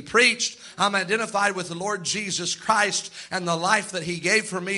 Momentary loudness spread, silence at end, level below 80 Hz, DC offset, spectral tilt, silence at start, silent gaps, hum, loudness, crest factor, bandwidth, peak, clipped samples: 9 LU; 0 s; -66 dBFS; under 0.1%; -2 dB/octave; 0 s; none; none; -23 LUFS; 20 dB; 11.5 kHz; -4 dBFS; under 0.1%